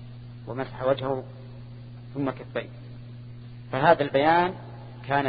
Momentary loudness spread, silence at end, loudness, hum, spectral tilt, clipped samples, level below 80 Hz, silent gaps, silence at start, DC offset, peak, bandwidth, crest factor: 22 LU; 0 s; -26 LUFS; none; -10.5 dB/octave; under 0.1%; -56 dBFS; none; 0 s; under 0.1%; -4 dBFS; 5 kHz; 24 dB